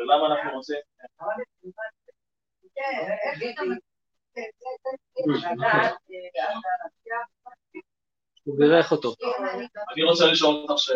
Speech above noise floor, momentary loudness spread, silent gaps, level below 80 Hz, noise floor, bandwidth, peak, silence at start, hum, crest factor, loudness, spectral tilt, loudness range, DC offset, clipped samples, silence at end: over 67 dB; 20 LU; none; -76 dBFS; under -90 dBFS; 7.6 kHz; -4 dBFS; 0 s; none; 22 dB; -25 LUFS; -4 dB/octave; 10 LU; under 0.1%; under 0.1%; 0 s